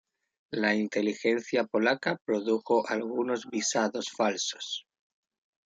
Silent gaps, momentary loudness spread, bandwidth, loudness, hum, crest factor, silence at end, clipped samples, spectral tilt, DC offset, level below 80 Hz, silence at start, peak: 2.21-2.25 s; 5 LU; 9.6 kHz; -29 LUFS; none; 18 dB; 0.85 s; under 0.1%; -3.5 dB/octave; under 0.1%; -78 dBFS; 0.5 s; -12 dBFS